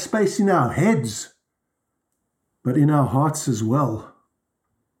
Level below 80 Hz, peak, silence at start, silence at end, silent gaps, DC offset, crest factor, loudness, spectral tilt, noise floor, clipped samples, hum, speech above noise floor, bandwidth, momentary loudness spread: -58 dBFS; -6 dBFS; 0 s; 0.9 s; none; under 0.1%; 16 dB; -20 LUFS; -6.5 dB/octave; -78 dBFS; under 0.1%; none; 58 dB; 15.5 kHz; 12 LU